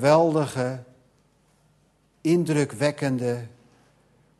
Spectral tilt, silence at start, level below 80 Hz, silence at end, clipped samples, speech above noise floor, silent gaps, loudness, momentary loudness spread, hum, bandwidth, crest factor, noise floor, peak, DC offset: -6.5 dB/octave; 0 s; -66 dBFS; 0.9 s; under 0.1%; 41 dB; none; -24 LUFS; 13 LU; none; 12.5 kHz; 18 dB; -64 dBFS; -6 dBFS; under 0.1%